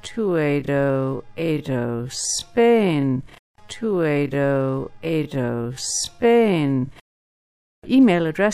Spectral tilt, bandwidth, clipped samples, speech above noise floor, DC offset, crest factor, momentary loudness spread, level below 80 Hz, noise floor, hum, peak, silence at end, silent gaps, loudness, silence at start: -5.5 dB/octave; 14 kHz; under 0.1%; over 70 dB; under 0.1%; 16 dB; 10 LU; -52 dBFS; under -90 dBFS; none; -4 dBFS; 0 s; 3.39-3.54 s, 7.01-7.82 s; -21 LUFS; 0.05 s